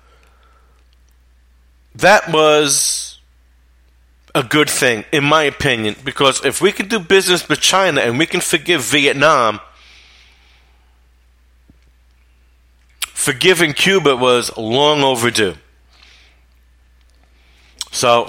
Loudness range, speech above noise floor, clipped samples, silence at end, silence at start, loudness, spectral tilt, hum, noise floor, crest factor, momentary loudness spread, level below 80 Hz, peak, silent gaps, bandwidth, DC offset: 6 LU; 38 dB; under 0.1%; 0 s; 1.95 s; -14 LUFS; -2.5 dB/octave; none; -51 dBFS; 18 dB; 9 LU; -48 dBFS; 0 dBFS; none; 16.5 kHz; under 0.1%